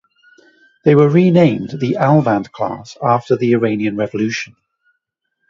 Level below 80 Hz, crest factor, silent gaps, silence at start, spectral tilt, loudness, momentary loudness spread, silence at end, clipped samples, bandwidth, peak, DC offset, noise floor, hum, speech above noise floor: -56 dBFS; 16 dB; none; 0.85 s; -8 dB/octave; -15 LUFS; 12 LU; 1.05 s; under 0.1%; 7.4 kHz; 0 dBFS; under 0.1%; -73 dBFS; none; 59 dB